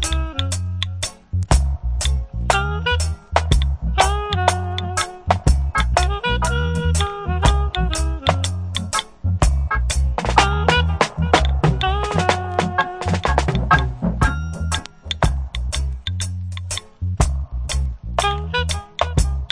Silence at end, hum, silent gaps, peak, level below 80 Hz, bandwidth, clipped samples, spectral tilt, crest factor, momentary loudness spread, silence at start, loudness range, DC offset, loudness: 0.05 s; none; none; 0 dBFS; -24 dBFS; 10.5 kHz; under 0.1%; -4.5 dB/octave; 20 dB; 8 LU; 0 s; 5 LU; under 0.1%; -20 LUFS